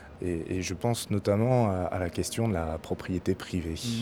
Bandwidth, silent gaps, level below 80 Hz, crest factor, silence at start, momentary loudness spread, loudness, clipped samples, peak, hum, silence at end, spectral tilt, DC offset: 17 kHz; none; -48 dBFS; 18 dB; 0 s; 8 LU; -30 LUFS; under 0.1%; -12 dBFS; none; 0 s; -6 dB/octave; under 0.1%